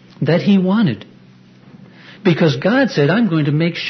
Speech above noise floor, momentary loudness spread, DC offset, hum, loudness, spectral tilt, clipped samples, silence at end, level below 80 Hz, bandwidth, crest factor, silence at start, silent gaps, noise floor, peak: 30 dB; 5 LU; under 0.1%; none; -15 LUFS; -7.5 dB/octave; under 0.1%; 0 s; -60 dBFS; 6.4 kHz; 16 dB; 0.2 s; none; -45 dBFS; -2 dBFS